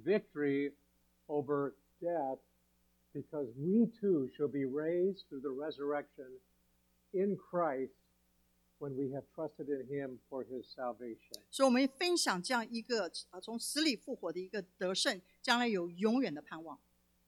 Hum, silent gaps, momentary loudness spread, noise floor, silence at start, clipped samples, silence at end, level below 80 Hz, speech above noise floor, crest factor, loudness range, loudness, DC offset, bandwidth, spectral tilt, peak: 60 Hz at -70 dBFS; none; 14 LU; -74 dBFS; 0 s; under 0.1%; 0.5 s; -78 dBFS; 38 dB; 22 dB; 6 LU; -36 LUFS; under 0.1%; 18.5 kHz; -4 dB/octave; -16 dBFS